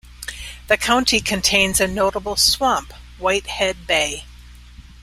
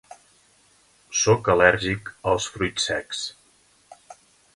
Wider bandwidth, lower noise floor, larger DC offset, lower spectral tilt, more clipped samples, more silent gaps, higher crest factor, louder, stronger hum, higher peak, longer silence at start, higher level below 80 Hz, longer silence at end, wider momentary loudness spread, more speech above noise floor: first, 16 kHz vs 11.5 kHz; second, -41 dBFS vs -60 dBFS; neither; about the same, -2 dB/octave vs -3 dB/octave; neither; neither; about the same, 20 dB vs 22 dB; first, -18 LUFS vs -22 LUFS; first, 60 Hz at -40 dBFS vs none; about the same, -2 dBFS vs -2 dBFS; second, 0.05 s vs 1.1 s; first, -40 dBFS vs -50 dBFS; second, 0.2 s vs 0.4 s; first, 16 LU vs 12 LU; second, 22 dB vs 37 dB